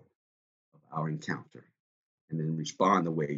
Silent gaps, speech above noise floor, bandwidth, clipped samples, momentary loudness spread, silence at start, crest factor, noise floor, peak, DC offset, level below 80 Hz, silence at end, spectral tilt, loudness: 1.80-2.28 s; over 59 dB; 7.8 kHz; under 0.1%; 13 LU; 0.9 s; 22 dB; under -90 dBFS; -12 dBFS; under 0.1%; -76 dBFS; 0 s; -6 dB/octave; -31 LUFS